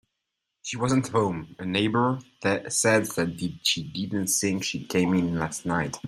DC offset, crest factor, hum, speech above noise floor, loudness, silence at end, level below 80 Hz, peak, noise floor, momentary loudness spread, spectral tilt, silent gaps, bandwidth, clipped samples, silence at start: under 0.1%; 18 dB; none; 56 dB; -26 LUFS; 0 s; -60 dBFS; -8 dBFS; -82 dBFS; 7 LU; -4 dB/octave; none; 16 kHz; under 0.1%; 0.65 s